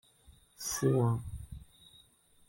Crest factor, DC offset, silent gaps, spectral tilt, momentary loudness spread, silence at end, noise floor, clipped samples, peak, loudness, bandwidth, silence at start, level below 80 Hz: 18 dB; under 0.1%; none; -5.5 dB/octave; 21 LU; 0.85 s; -64 dBFS; under 0.1%; -16 dBFS; -32 LUFS; 16.5 kHz; 0.3 s; -54 dBFS